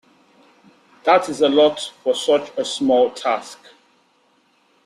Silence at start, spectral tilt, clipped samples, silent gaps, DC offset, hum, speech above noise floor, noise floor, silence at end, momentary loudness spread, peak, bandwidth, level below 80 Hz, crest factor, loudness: 1.05 s; -3 dB/octave; under 0.1%; none; under 0.1%; none; 42 dB; -60 dBFS; 1.3 s; 10 LU; -2 dBFS; 13 kHz; -66 dBFS; 18 dB; -18 LUFS